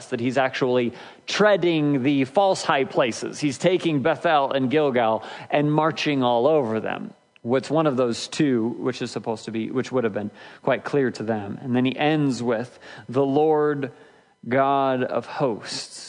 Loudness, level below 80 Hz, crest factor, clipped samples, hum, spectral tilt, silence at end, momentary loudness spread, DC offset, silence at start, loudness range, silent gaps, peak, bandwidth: -23 LUFS; -72 dBFS; 18 dB; under 0.1%; none; -5.5 dB/octave; 0 s; 10 LU; under 0.1%; 0 s; 4 LU; none; -4 dBFS; 10.5 kHz